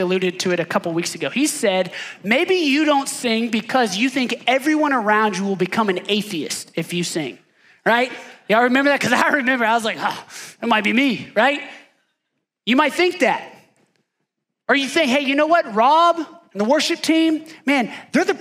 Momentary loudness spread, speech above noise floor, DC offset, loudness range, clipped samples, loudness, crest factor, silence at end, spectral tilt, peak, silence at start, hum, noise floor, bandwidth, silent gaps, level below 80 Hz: 10 LU; 58 dB; under 0.1%; 4 LU; under 0.1%; -19 LUFS; 18 dB; 0 s; -3.5 dB/octave; -2 dBFS; 0 s; none; -77 dBFS; 16 kHz; none; -76 dBFS